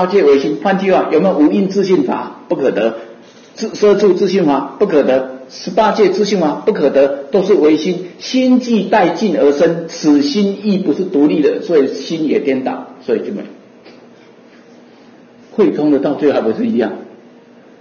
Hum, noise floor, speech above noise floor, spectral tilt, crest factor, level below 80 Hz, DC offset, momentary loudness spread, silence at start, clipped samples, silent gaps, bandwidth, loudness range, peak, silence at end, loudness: none; -42 dBFS; 29 dB; -6.5 dB/octave; 14 dB; -58 dBFS; under 0.1%; 10 LU; 0 s; under 0.1%; none; 7 kHz; 6 LU; 0 dBFS; 0.7 s; -14 LUFS